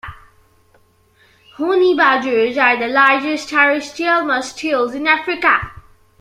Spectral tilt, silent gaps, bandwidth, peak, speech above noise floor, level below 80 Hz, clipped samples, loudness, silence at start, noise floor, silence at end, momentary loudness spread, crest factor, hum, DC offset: -3.5 dB/octave; none; 13 kHz; 0 dBFS; 39 dB; -50 dBFS; under 0.1%; -15 LUFS; 0.05 s; -54 dBFS; 0.4 s; 7 LU; 16 dB; none; under 0.1%